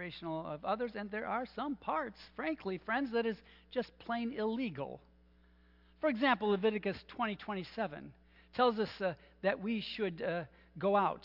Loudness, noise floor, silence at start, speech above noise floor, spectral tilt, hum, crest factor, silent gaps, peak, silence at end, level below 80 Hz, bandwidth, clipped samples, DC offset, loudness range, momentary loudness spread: -37 LUFS; -65 dBFS; 0 s; 29 dB; -7.5 dB/octave; none; 20 dB; none; -16 dBFS; 0.05 s; -66 dBFS; 5.8 kHz; under 0.1%; under 0.1%; 4 LU; 10 LU